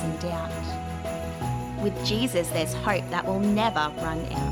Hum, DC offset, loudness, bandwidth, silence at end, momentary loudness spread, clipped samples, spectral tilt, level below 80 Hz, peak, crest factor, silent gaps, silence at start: none; under 0.1%; -27 LUFS; 18.5 kHz; 0 s; 9 LU; under 0.1%; -5 dB/octave; -42 dBFS; -10 dBFS; 18 dB; none; 0 s